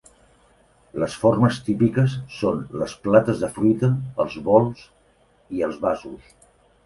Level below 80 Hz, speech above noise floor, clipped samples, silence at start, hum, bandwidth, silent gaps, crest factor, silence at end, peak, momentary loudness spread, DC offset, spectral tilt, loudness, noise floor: -52 dBFS; 38 dB; under 0.1%; 0.95 s; none; 11.5 kHz; none; 20 dB; 0.7 s; -2 dBFS; 11 LU; under 0.1%; -7.5 dB/octave; -22 LUFS; -59 dBFS